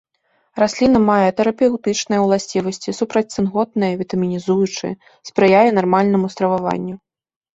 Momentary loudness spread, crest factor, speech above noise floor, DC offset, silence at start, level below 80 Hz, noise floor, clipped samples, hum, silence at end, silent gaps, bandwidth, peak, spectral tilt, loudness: 12 LU; 16 dB; 47 dB; under 0.1%; 0.55 s; -52 dBFS; -64 dBFS; under 0.1%; none; 0.55 s; none; 8 kHz; -2 dBFS; -5.5 dB/octave; -17 LUFS